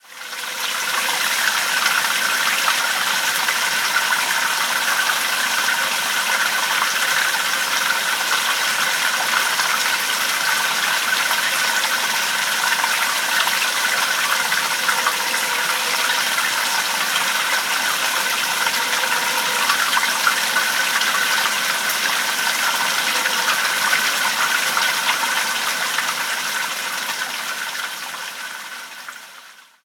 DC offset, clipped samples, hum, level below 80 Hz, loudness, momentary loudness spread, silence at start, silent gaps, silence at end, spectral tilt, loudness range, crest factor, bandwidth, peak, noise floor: under 0.1%; under 0.1%; none; -90 dBFS; -18 LUFS; 6 LU; 0.1 s; none; 0.3 s; 1.5 dB/octave; 2 LU; 18 dB; 19.5 kHz; -2 dBFS; -44 dBFS